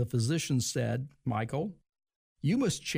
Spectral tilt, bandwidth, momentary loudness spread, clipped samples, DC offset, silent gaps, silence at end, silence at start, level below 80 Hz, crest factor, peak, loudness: -5 dB/octave; 15.5 kHz; 6 LU; under 0.1%; under 0.1%; 2.16-2.36 s; 0 s; 0 s; -62 dBFS; 12 dB; -20 dBFS; -32 LUFS